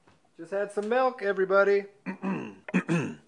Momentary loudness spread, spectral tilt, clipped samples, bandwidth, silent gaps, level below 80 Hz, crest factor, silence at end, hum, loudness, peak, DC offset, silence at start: 12 LU; -7 dB/octave; under 0.1%; 10.5 kHz; none; -78 dBFS; 18 dB; 0.1 s; none; -28 LUFS; -10 dBFS; under 0.1%; 0.4 s